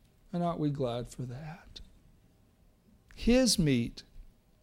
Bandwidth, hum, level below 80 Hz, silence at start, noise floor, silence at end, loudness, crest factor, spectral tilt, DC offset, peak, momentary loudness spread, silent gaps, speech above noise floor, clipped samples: 16 kHz; none; -48 dBFS; 0.35 s; -64 dBFS; 0.35 s; -31 LUFS; 18 dB; -5 dB/octave; under 0.1%; -14 dBFS; 24 LU; none; 34 dB; under 0.1%